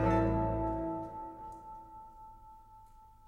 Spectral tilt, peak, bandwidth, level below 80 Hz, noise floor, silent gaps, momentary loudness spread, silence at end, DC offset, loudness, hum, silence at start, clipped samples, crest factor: -9.5 dB/octave; -16 dBFS; 8.6 kHz; -46 dBFS; -57 dBFS; none; 24 LU; 0.15 s; under 0.1%; -35 LUFS; none; 0 s; under 0.1%; 20 dB